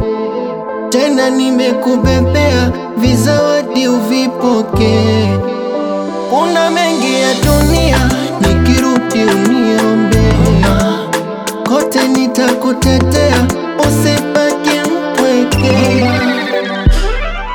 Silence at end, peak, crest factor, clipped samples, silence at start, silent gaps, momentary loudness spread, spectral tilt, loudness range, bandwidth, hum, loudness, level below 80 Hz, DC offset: 0 s; 0 dBFS; 12 dB; under 0.1%; 0 s; none; 6 LU; -5.5 dB/octave; 2 LU; over 20 kHz; none; -12 LUFS; -22 dBFS; 0.1%